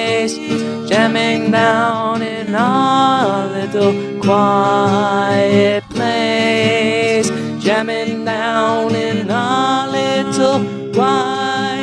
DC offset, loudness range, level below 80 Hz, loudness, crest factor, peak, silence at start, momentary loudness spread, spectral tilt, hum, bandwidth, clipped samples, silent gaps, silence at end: under 0.1%; 2 LU; -58 dBFS; -15 LUFS; 14 dB; 0 dBFS; 0 s; 6 LU; -5 dB/octave; none; 11 kHz; under 0.1%; none; 0 s